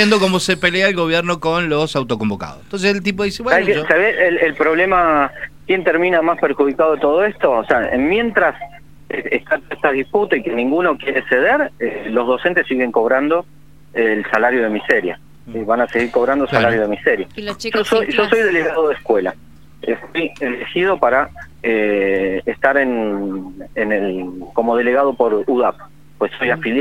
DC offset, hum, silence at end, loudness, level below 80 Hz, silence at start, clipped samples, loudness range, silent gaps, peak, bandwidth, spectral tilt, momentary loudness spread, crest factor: 0.8%; none; 0 s; -16 LUFS; -48 dBFS; 0 s; under 0.1%; 3 LU; none; 0 dBFS; 15 kHz; -5 dB/octave; 9 LU; 16 dB